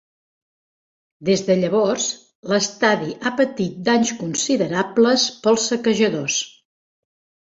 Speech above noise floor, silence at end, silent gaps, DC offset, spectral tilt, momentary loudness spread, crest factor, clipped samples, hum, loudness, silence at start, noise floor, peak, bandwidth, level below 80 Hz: over 71 dB; 1 s; 2.35-2.43 s; under 0.1%; -3.5 dB/octave; 6 LU; 18 dB; under 0.1%; none; -19 LUFS; 1.2 s; under -90 dBFS; -2 dBFS; 8 kHz; -62 dBFS